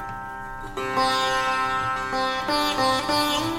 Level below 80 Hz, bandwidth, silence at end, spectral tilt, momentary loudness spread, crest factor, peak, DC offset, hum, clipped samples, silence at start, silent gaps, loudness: -46 dBFS; 17.5 kHz; 0 s; -3 dB/octave; 12 LU; 14 dB; -10 dBFS; under 0.1%; none; under 0.1%; 0 s; none; -23 LUFS